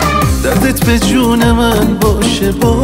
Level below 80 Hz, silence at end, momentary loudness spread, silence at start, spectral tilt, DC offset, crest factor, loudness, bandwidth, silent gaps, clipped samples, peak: -20 dBFS; 0 s; 2 LU; 0 s; -5 dB/octave; under 0.1%; 10 dB; -11 LUFS; 16.5 kHz; none; under 0.1%; 0 dBFS